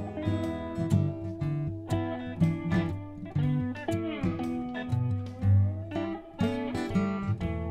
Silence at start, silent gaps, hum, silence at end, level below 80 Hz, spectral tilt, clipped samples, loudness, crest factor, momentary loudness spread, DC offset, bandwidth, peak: 0 s; none; none; 0 s; -50 dBFS; -8.5 dB/octave; under 0.1%; -31 LUFS; 18 dB; 7 LU; under 0.1%; 10.5 kHz; -12 dBFS